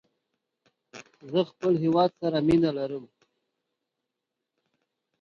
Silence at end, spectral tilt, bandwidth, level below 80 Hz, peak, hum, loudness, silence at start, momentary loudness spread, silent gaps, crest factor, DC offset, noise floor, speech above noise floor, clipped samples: 2.15 s; -8 dB/octave; 7.2 kHz; -62 dBFS; -10 dBFS; none; -26 LUFS; 0.95 s; 12 LU; none; 20 dB; under 0.1%; -85 dBFS; 60 dB; under 0.1%